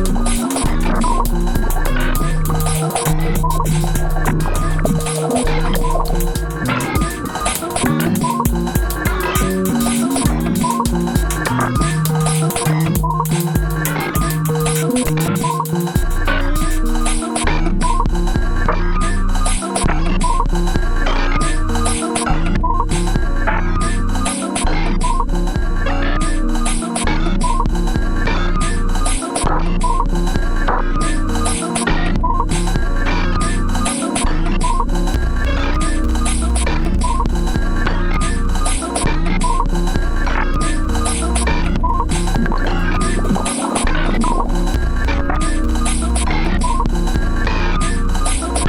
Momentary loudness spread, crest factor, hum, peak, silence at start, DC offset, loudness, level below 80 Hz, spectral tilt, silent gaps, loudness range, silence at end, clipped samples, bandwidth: 3 LU; 14 dB; none; -2 dBFS; 0 s; under 0.1%; -18 LUFS; -18 dBFS; -5 dB/octave; none; 2 LU; 0 s; under 0.1%; 17.5 kHz